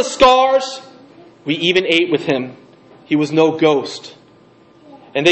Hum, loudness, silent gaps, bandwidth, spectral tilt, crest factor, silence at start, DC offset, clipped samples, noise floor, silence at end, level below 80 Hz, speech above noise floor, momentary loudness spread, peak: none; -15 LUFS; none; 8.6 kHz; -4.5 dB/octave; 16 dB; 0 s; under 0.1%; under 0.1%; -48 dBFS; 0 s; -48 dBFS; 33 dB; 18 LU; 0 dBFS